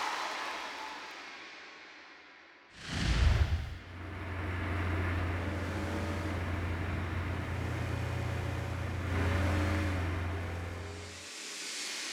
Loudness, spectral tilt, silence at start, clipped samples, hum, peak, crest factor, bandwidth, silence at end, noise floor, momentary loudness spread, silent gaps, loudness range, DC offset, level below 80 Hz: -35 LUFS; -5 dB/octave; 0 s; under 0.1%; none; -16 dBFS; 18 dB; 13.5 kHz; 0 s; -56 dBFS; 15 LU; none; 2 LU; under 0.1%; -44 dBFS